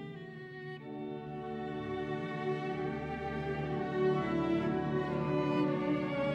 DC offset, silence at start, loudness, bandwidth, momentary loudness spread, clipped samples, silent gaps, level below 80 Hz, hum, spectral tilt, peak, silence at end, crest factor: under 0.1%; 0 s; -35 LUFS; 8 kHz; 12 LU; under 0.1%; none; -58 dBFS; none; -8.5 dB/octave; -20 dBFS; 0 s; 14 dB